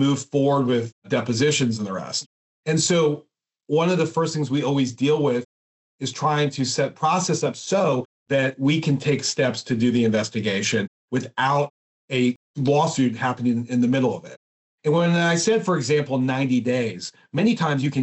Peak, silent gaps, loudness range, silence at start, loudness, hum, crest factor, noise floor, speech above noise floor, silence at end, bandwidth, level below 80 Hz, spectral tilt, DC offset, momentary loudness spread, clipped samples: -8 dBFS; 0.92-1.02 s, 2.26-2.63 s, 5.45-5.99 s, 8.05-8.26 s, 10.88-11.08 s, 11.70-12.08 s, 12.36-12.54 s, 14.37-14.78 s; 2 LU; 0 s; -22 LUFS; none; 14 dB; under -90 dBFS; over 69 dB; 0 s; 8.4 kHz; -68 dBFS; -5 dB/octave; under 0.1%; 8 LU; under 0.1%